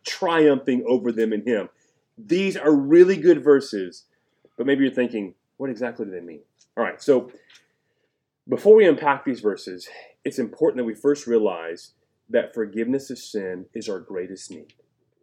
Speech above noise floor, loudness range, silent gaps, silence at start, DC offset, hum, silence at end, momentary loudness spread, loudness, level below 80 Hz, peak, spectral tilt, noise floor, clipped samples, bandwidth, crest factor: 53 dB; 9 LU; none; 0.05 s; under 0.1%; none; 0.6 s; 19 LU; -21 LUFS; -78 dBFS; -2 dBFS; -6 dB/octave; -74 dBFS; under 0.1%; 11 kHz; 20 dB